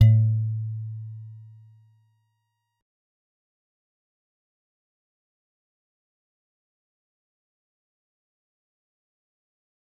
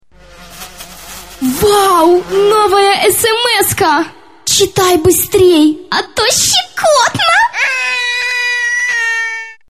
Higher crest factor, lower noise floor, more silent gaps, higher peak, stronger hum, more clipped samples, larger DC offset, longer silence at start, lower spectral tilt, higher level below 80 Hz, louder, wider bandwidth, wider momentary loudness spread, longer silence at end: first, 26 dB vs 12 dB; first, -77 dBFS vs -38 dBFS; neither; second, -4 dBFS vs 0 dBFS; neither; neither; second, under 0.1% vs 0.5%; second, 0 s vs 0.4 s; first, -9.5 dB/octave vs -2.5 dB/octave; second, -60 dBFS vs -40 dBFS; second, -25 LUFS vs -10 LUFS; second, 3.7 kHz vs 15.5 kHz; first, 24 LU vs 13 LU; first, 8.55 s vs 0.15 s